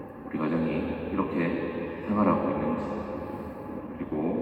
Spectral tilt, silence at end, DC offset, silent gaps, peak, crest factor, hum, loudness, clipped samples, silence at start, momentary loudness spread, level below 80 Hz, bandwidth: -9.5 dB/octave; 0 s; under 0.1%; none; -10 dBFS; 18 dB; none; -30 LUFS; under 0.1%; 0 s; 12 LU; -54 dBFS; 5.4 kHz